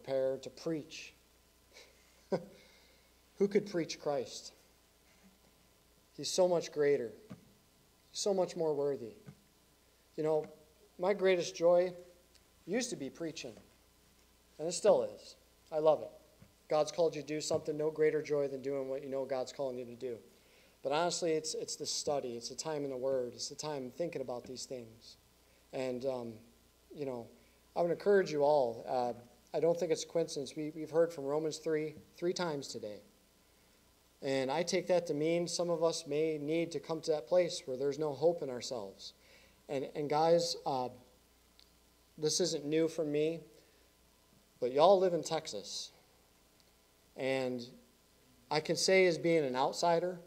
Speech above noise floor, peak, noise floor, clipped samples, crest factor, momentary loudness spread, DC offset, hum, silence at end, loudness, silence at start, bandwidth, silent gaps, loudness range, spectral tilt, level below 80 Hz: 33 dB; -12 dBFS; -67 dBFS; under 0.1%; 22 dB; 15 LU; under 0.1%; none; 0 s; -35 LUFS; 0.05 s; 16 kHz; none; 6 LU; -4 dB/octave; -74 dBFS